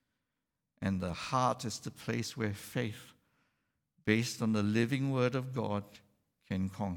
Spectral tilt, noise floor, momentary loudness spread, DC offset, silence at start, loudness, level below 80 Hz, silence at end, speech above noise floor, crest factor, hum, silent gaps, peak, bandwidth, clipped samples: -5.5 dB/octave; -87 dBFS; 9 LU; under 0.1%; 0.8 s; -34 LUFS; -66 dBFS; 0 s; 54 dB; 22 dB; none; none; -14 dBFS; 18.5 kHz; under 0.1%